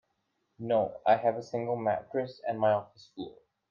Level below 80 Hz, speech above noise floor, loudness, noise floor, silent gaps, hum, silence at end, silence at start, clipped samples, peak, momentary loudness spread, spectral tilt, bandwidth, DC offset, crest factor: -74 dBFS; 48 dB; -30 LUFS; -78 dBFS; none; none; 0.4 s; 0.6 s; under 0.1%; -12 dBFS; 17 LU; -7.5 dB/octave; 7.2 kHz; under 0.1%; 20 dB